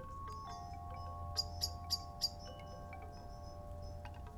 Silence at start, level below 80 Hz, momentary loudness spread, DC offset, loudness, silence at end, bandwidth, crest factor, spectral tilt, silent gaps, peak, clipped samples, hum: 0 s; -54 dBFS; 13 LU; under 0.1%; -44 LUFS; 0 s; 18 kHz; 22 dB; -3 dB/octave; none; -24 dBFS; under 0.1%; none